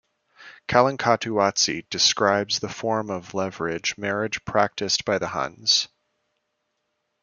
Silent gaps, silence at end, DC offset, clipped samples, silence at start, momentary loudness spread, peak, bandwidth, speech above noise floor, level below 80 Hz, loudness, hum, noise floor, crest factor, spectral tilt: none; 1.35 s; under 0.1%; under 0.1%; 0.4 s; 8 LU; -2 dBFS; 10 kHz; 53 dB; -60 dBFS; -23 LUFS; none; -76 dBFS; 24 dB; -2.5 dB/octave